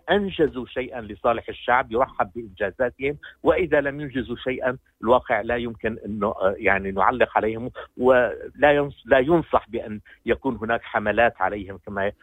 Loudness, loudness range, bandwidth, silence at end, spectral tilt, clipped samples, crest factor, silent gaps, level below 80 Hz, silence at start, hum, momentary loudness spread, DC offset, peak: -23 LUFS; 3 LU; 16 kHz; 0.1 s; -8 dB/octave; under 0.1%; 20 dB; none; -48 dBFS; 0.05 s; none; 11 LU; under 0.1%; -4 dBFS